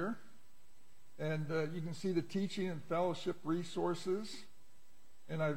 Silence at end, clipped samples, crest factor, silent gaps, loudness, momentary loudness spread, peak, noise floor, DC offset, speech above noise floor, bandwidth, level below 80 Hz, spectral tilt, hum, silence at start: 0 s; under 0.1%; 16 dB; none; -39 LUFS; 7 LU; -24 dBFS; -70 dBFS; 0.5%; 32 dB; 16.5 kHz; -76 dBFS; -6.5 dB/octave; none; 0 s